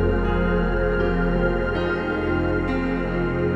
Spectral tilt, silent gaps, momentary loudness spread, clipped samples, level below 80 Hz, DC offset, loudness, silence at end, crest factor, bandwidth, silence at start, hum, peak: -9 dB/octave; none; 2 LU; under 0.1%; -28 dBFS; under 0.1%; -23 LUFS; 0 s; 12 dB; 5.8 kHz; 0 s; none; -10 dBFS